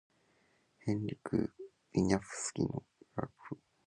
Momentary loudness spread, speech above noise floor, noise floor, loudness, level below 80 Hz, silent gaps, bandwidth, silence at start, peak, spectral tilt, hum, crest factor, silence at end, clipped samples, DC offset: 13 LU; 38 dB; -72 dBFS; -37 LUFS; -60 dBFS; none; 11.5 kHz; 0.85 s; -12 dBFS; -6 dB/octave; none; 26 dB; 0.3 s; under 0.1%; under 0.1%